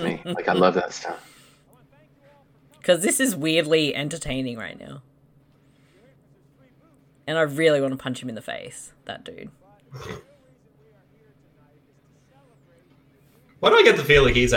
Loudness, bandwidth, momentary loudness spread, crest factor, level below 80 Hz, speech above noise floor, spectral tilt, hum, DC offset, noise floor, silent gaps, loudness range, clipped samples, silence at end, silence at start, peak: -21 LUFS; 18 kHz; 24 LU; 22 dB; -42 dBFS; 37 dB; -4 dB/octave; none; under 0.1%; -59 dBFS; none; 19 LU; under 0.1%; 0 s; 0 s; -4 dBFS